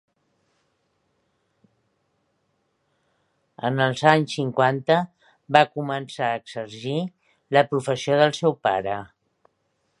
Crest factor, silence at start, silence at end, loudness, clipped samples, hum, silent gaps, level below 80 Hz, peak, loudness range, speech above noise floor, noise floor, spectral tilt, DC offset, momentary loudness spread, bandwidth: 24 dB; 3.6 s; 0.95 s; -22 LUFS; under 0.1%; none; none; -68 dBFS; 0 dBFS; 4 LU; 50 dB; -72 dBFS; -5.5 dB/octave; under 0.1%; 11 LU; 11.5 kHz